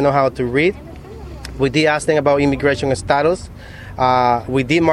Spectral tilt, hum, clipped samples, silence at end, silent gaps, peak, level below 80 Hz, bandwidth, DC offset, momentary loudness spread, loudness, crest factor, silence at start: -5.5 dB/octave; none; under 0.1%; 0 s; none; 0 dBFS; -38 dBFS; 13 kHz; under 0.1%; 19 LU; -16 LUFS; 16 dB; 0 s